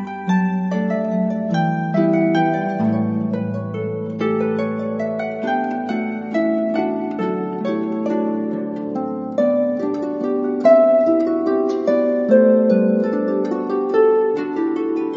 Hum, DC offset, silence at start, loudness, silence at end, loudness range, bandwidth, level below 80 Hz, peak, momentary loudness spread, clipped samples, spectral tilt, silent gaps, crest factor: none; under 0.1%; 0 s; -19 LUFS; 0 s; 6 LU; 7.2 kHz; -70 dBFS; -2 dBFS; 9 LU; under 0.1%; -9 dB/octave; none; 16 dB